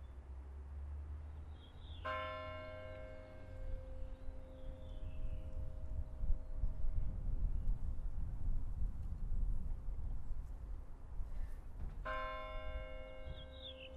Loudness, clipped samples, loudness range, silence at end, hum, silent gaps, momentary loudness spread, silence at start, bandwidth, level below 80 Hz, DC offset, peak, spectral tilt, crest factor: -48 LUFS; under 0.1%; 5 LU; 0 s; none; none; 10 LU; 0 s; 4.5 kHz; -42 dBFS; under 0.1%; -22 dBFS; -7 dB/octave; 18 dB